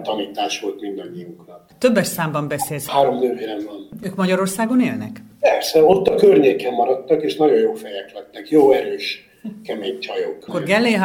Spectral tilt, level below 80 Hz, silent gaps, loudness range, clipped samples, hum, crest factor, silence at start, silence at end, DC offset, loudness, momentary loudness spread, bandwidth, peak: -5 dB/octave; -58 dBFS; none; 5 LU; under 0.1%; none; 18 dB; 0 s; 0 s; under 0.1%; -18 LUFS; 17 LU; 19.5 kHz; 0 dBFS